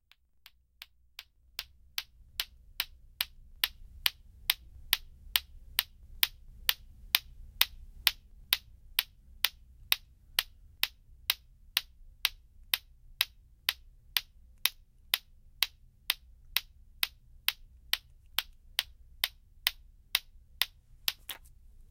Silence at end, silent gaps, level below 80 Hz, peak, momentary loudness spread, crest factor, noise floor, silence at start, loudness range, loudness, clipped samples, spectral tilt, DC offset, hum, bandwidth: 0.55 s; none; -56 dBFS; 0 dBFS; 13 LU; 38 dB; -62 dBFS; 1.6 s; 4 LU; -33 LUFS; under 0.1%; 1.5 dB/octave; under 0.1%; none; 17 kHz